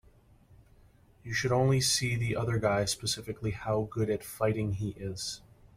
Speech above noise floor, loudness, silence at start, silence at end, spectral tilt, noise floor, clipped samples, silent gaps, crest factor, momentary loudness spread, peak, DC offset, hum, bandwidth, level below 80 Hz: 30 dB; -30 LUFS; 0.5 s; 0.4 s; -4.5 dB/octave; -60 dBFS; under 0.1%; none; 16 dB; 11 LU; -14 dBFS; under 0.1%; none; 16 kHz; -54 dBFS